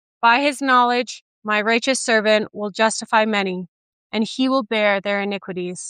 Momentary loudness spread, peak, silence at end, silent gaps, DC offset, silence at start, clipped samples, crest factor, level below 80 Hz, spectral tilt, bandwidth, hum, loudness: 11 LU; -2 dBFS; 0 s; 1.21-1.42 s, 3.68-4.10 s; under 0.1%; 0.2 s; under 0.1%; 18 dB; -74 dBFS; -3 dB/octave; 14.5 kHz; none; -19 LUFS